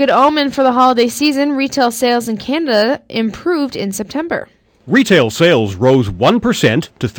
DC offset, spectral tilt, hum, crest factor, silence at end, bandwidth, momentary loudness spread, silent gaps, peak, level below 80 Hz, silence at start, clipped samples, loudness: under 0.1%; -5 dB/octave; none; 12 dB; 0 s; 19 kHz; 9 LU; none; -2 dBFS; -46 dBFS; 0 s; under 0.1%; -14 LUFS